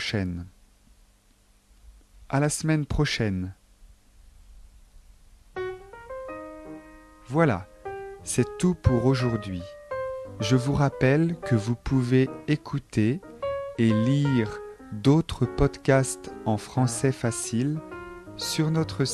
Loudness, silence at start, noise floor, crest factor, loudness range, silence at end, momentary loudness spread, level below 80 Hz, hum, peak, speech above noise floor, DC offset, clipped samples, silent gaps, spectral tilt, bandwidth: -26 LUFS; 0 s; -60 dBFS; 20 dB; 8 LU; 0 s; 16 LU; -44 dBFS; none; -6 dBFS; 36 dB; under 0.1%; under 0.1%; none; -6 dB/octave; 13 kHz